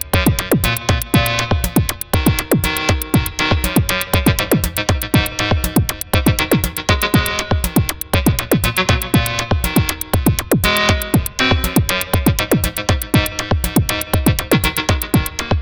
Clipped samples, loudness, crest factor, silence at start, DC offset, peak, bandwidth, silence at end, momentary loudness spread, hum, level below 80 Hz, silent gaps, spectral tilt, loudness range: under 0.1%; -16 LUFS; 16 dB; 0 s; under 0.1%; 0 dBFS; over 20 kHz; 0 s; 3 LU; none; -26 dBFS; none; -4.5 dB/octave; 1 LU